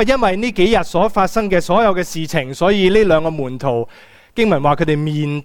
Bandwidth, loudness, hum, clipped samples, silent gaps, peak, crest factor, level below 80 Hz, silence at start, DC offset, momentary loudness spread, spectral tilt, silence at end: 17.5 kHz; -16 LUFS; none; under 0.1%; none; -2 dBFS; 14 dB; -34 dBFS; 0 s; under 0.1%; 8 LU; -6 dB/octave; 0 s